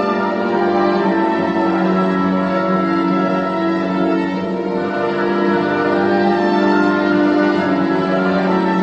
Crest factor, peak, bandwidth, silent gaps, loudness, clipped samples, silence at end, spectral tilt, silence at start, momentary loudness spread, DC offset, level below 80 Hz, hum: 14 dB; -2 dBFS; 8 kHz; none; -16 LUFS; under 0.1%; 0 s; -8 dB/octave; 0 s; 4 LU; under 0.1%; -52 dBFS; none